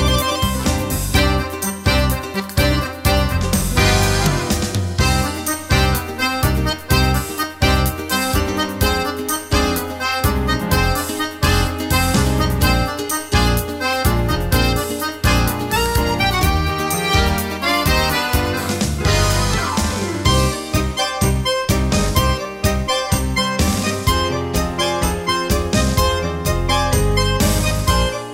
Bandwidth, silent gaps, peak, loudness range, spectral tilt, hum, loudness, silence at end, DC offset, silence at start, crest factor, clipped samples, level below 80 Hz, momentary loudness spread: 16.5 kHz; none; 0 dBFS; 1 LU; -4 dB/octave; none; -18 LUFS; 0 s; under 0.1%; 0 s; 16 dB; under 0.1%; -24 dBFS; 4 LU